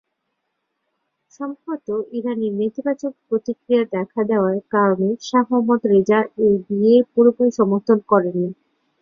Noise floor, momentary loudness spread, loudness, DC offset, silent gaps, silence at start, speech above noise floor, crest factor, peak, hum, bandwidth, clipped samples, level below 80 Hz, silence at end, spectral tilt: -75 dBFS; 10 LU; -19 LUFS; under 0.1%; none; 1.4 s; 57 dB; 18 dB; -2 dBFS; none; 7.2 kHz; under 0.1%; -64 dBFS; 0.5 s; -7.5 dB/octave